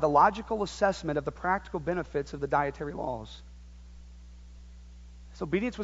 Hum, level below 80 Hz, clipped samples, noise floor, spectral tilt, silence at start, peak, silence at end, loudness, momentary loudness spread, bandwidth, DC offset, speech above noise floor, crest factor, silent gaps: 60 Hz at -50 dBFS; -48 dBFS; under 0.1%; -48 dBFS; -6 dB/octave; 0 s; -10 dBFS; 0 s; -30 LUFS; 24 LU; 8 kHz; under 0.1%; 19 dB; 20 dB; none